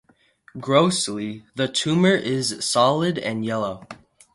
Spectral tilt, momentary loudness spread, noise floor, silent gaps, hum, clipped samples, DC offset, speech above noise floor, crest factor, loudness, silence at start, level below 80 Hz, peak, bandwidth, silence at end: -4.5 dB/octave; 13 LU; -56 dBFS; none; none; under 0.1%; under 0.1%; 35 dB; 20 dB; -21 LUFS; 0.55 s; -62 dBFS; -2 dBFS; 11.5 kHz; 0.4 s